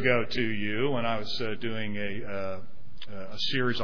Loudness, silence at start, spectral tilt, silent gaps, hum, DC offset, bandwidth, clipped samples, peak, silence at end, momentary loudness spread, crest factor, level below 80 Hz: -31 LUFS; 0 s; -6 dB/octave; none; none; 4%; 5.4 kHz; under 0.1%; -8 dBFS; 0 s; 15 LU; 22 dB; -56 dBFS